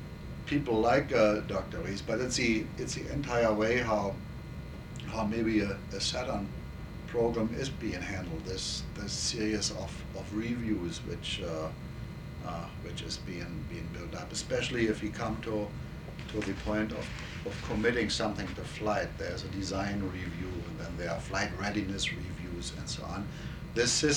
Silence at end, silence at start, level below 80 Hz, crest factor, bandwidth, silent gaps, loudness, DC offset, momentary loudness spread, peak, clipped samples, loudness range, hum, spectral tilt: 0 s; 0 s; -46 dBFS; 20 dB; 19 kHz; none; -33 LUFS; under 0.1%; 12 LU; -12 dBFS; under 0.1%; 6 LU; none; -4.5 dB/octave